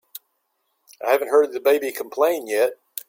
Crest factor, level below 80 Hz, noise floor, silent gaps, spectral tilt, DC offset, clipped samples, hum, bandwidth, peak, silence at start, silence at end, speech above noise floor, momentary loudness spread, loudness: 16 dB; -74 dBFS; -72 dBFS; none; -2 dB/octave; under 0.1%; under 0.1%; none; 17 kHz; -6 dBFS; 1 s; 0.1 s; 52 dB; 12 LU; -21 LUFS